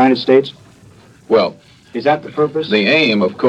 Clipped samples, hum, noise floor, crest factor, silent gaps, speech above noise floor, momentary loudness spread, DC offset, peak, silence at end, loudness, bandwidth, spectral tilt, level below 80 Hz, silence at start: under 0.1%; none; -44 dBFS; 16 dB; none; 30 dB; 9 LU; under 0.1%; 0 dBFS; 0 s; -14 LUFS; 9 kHz; -6.5 dB/octave; -60 dBFS; 0 s